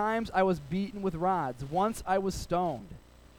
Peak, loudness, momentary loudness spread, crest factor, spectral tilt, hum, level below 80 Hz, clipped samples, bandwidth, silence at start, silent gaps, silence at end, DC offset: -14 dBFS; -31 LUFS; 6 LU; 16 dB; -6 dB/octave; none; -50 dBFS; under 0.1%; 17.5 kHz; 0 s; none; 0.4 s; under 0.1%